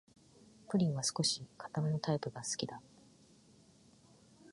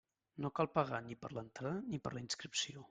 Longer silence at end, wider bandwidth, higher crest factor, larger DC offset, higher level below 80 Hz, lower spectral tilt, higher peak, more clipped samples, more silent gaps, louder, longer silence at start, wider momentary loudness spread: about the same, 0 s vs 0.05 s; first, 11.5 kHz vs 9.4 kHz; about the same, 20 dB vs 24 dB; neither; about the same, -74 dBFS vs -74 dBFS; about the same, -4.5 dB/octave vs -4 dB/octave; about the same, -20 dBFS vs -18 dBFS; neither; neither; first, -36 LUFS vs -41 LUFS; first, 0.7 s vs 0.35 s; about the same, 10 LU vs 11 LU